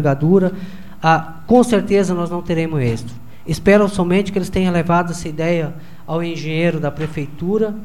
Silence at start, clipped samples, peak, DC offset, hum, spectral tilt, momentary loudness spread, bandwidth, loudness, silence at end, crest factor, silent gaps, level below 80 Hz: 0 s; under 0.1%; 0 dBFS; 3%; none; -7 dB/octave; 12 LU; 15 kHz; -17 LUFS; 0 s; 16 dB; none; -40 dBFS